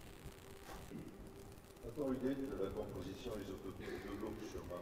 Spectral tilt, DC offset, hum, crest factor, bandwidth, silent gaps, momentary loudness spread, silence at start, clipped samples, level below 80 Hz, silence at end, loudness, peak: -6 dB/octave; under 0.1%; none; 18 dB; 16 kHz; none; 15 LU; 0 s; under 0.1%; -60 dBFS; 0 s; -47 LUFS; -28 dBFS